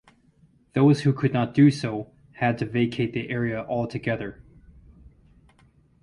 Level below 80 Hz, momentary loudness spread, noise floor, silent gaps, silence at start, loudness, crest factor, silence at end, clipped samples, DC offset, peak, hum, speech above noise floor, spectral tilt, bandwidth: -56 dBFS; 12 LU; -59 dBFS; none; 0.75 s; -24 LUFS; 18 dB; 1.7 s; under 0.1%; under 0.1%; -6 dBFS; none; 37 dB; -7.5 dB/octave; 11 kHz